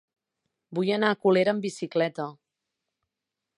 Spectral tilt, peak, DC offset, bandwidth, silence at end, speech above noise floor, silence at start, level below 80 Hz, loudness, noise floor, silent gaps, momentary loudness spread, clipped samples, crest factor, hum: -6 dB/octave; -8 dBFS; under 0.1%; 11.5 kHz; 1.25 s; 61 dB; 0.7 s; -80 dBFS; -26 LUFS; -86 dBFS; none; 13 LU; under 0.1%; 20 dB; none